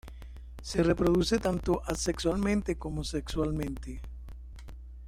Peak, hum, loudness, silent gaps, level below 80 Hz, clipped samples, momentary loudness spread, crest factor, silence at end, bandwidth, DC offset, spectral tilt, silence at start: -14 dBFS; none; -30 LUFS; none; -40 dBFS; under 0.1%; 21 LU; 18 dB; 0 s; 16 kHz; under 0.1%; -5.5 dB/octave; 0.05 s